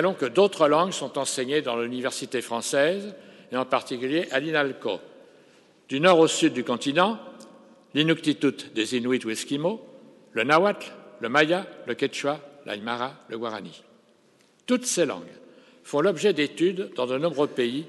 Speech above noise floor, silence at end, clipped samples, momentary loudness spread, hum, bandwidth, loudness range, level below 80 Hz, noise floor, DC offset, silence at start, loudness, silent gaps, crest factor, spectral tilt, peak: 36 dB; 0 s; under 0.1%; 13 LU; none; 12 kHz; 6 LU; -80 dBFS; -61 dBFS; under 0.1%; 0 s; -25 LUFS; none; 22 dB; -4 dB/octave; -4 dBFS